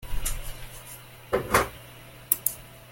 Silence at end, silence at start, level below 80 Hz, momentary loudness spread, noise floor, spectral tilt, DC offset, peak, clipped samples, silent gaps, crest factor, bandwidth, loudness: 0 s; 0 s; -38 dBFS; 20 LU; -47 dBFS; -3 dB/octave; under 0.1%; 0 dBFS; under 0.1%; none; 30 dB; 17 kHz; -27 LUFS